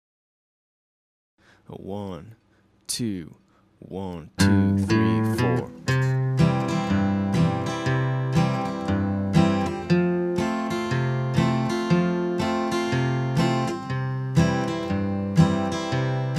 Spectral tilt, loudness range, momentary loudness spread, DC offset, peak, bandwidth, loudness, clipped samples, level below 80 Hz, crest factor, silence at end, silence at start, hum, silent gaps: -6.5 dB/octave; 12 LU; 13 LU; under 0.1%; -6 dBFS; 14 kHz; -24 LUFS; under 0.1%; -50 dBFS; 18 dB; 0 s; 1.7 s; none; none